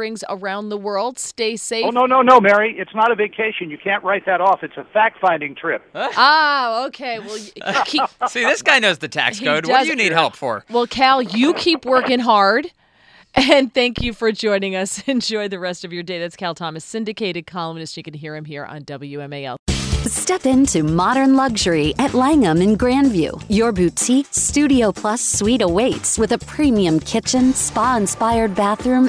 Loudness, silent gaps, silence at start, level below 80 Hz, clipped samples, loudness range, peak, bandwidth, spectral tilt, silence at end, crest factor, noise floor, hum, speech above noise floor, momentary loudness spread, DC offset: -17 LUFS; 19.59-19.66 s; 0 s; -40 dBFS; under 0.1%; 8 LU; 0 dBFS; 11 kHz; -3.5 dB/octave; 0 s; 18 dB; -51 dBFS; none; 33 dB; 13 LU; under 0.1%